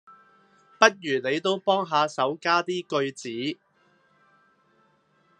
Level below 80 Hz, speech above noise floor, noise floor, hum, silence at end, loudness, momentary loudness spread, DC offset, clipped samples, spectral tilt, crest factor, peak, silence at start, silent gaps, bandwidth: -80 dBFS; 40 dB; -65 dBFS; none; 1.85 s; -25 LUFS; 11 LU; under 0.1%; under 0.1%; -3.5 dB/octave; 26 dB; 0 dBFS; 0.1 s; none; 10.5 kHz